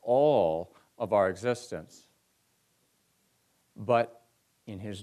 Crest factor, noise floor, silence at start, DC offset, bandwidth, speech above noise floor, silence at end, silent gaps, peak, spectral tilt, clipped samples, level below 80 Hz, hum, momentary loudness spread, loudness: 18 dB; -72 dBFS; 0.05 s; under 0.1%; 13 kHz; 42 dB; 0 s; none; -14 dBFS; -6 dB/octave; under 0.1%; -68 dBFS; none; 18 LU; -28 LUFS